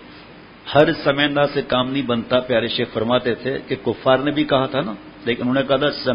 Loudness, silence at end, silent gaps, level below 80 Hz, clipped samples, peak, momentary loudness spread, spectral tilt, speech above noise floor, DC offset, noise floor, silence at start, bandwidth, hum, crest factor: -19 LUFS; 0 s; none; -50 dBFS; under 0.1%; 0 dBFS; 8 LU; -8.5 dB/octave; 23 dB; under 0.1%; -42 dBFS; 0 s; 5.4 kHz; none; 20 dB